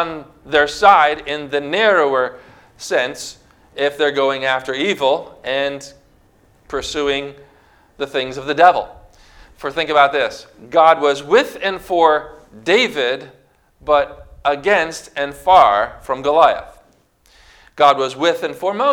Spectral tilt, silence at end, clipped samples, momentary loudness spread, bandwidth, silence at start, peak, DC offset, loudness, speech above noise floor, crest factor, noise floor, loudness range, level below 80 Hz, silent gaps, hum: -3.5 dB/octave; 0 s; under 0.1%; 14 LU; 18 kHz; 0 s; 0 dBFS; under 0.1%; -16 LUFS; 39 dB; 18 dB; -55 dBFS; 4 LU; -50 dBFS; none; none